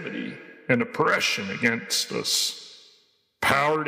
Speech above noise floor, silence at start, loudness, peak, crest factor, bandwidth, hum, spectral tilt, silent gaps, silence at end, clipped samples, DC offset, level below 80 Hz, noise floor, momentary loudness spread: 39 dB; 0 s; -24 LUFS; -6 dBFS; 20 dB; 16.5 kHz; none; -2.5 dB/octave; none; 0 s; under 0.1%; under 0.1%; -64 dBFS; -63 dBFS; 16 LU